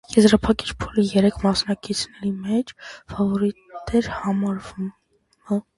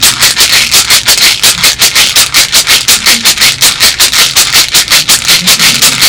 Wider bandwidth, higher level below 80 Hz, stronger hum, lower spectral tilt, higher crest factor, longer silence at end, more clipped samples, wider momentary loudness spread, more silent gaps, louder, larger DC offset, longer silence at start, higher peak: second, 11.5 kHz vs over 20 kHz; second, -44 dBFS vs -34 dBFS; neither; first, -5.5 dB/octave vs 1 dB/octave; first, 20 dB vs 6 dB; first, 0.15 s vs 0 s; second, under 0.1% vs 9%; first, 15 LU vs 1 LU; neither; second, -22 LUFS vs -3 LUFS; second, under 0.1% vs 0.2%; about the same, 0.1 s vs 0 s; about the same, -2 dBFS vs 0 dBFS